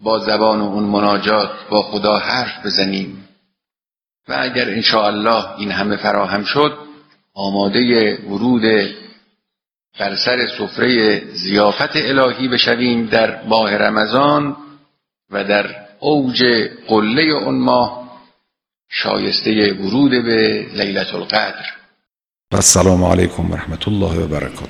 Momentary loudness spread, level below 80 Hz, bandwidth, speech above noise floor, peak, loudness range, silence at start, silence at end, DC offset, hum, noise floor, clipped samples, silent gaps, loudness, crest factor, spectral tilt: 9 LU; -42 dBFS; 19.5 kHz; over 74 dB; 0 dBFS; 3 LU; 0 s; 0 s; under 0.1%; none; under -90 dBFS; under 0.1%; none; -15 LUFS; 16 dB; -4 dB/octave